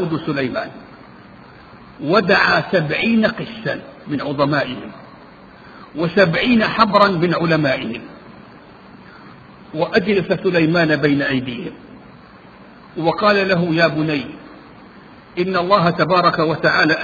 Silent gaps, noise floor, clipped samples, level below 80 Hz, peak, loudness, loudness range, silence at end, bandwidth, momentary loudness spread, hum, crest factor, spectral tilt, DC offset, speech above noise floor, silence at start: none; -42 dBFS; under 0.1%; -52 dBFS; 0 dBFS; -17 LUFS; 4 LU; 0 s; 7 kHz; 16 LU; none; 18 dB; -7 dB/octave; under 0.1%; 25 dB; 0 s